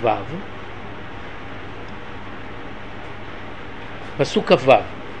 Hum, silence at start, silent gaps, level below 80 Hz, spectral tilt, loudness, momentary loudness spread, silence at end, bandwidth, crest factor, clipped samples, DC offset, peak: none; 0 s; none; -46 dBFS; -5.5 dB/octave; -19 LUFS; 18 LU; 0 s; 9.6 kHz; 24 dB; under 0.1%; 2%; 0 dBFS